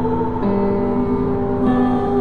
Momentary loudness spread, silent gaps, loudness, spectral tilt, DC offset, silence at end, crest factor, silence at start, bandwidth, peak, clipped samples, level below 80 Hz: 3 LU; none; -18 LUFS; -10 dB/octave; 3%; 0 s; 12 dB; 0 s; 4.7 kHz; -6 dBFS; under 0.1%; -34 dBFS